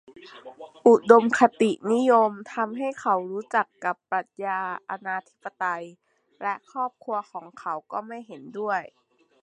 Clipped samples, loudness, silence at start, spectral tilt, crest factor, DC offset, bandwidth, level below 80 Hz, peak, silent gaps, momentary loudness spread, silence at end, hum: under 0.1%; -24 LUFS; 0.2 s; -5.5 dB/octave; 24 dB; under 0.1%; 10 kHz; -78 dBFS; -2 dBFS; none; 20 LU; 0.55 s; none